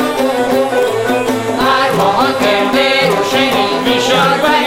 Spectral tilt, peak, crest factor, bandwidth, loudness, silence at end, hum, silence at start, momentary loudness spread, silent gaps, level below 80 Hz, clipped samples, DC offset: -4 dB/octave; -2 dBFS; 12 dB; 16.5 kHz; -12 LUFS; 0 s; none; 0 s; 4 LU; none; -44 dBFS; under 0.1%; under 0.1%